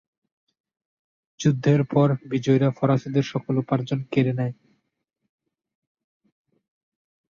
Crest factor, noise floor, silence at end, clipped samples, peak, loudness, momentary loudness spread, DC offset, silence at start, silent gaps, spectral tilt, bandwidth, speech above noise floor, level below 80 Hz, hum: 20 dB; -78 dBFS; 2.75 s; under 0.1%; -6 dBFS; -23 LUFS; 5 LU; under 0.1%; 1.4 s; none; -7.5 dB/octave; 7.2 kHz; 57 dB; -62 dBFS; none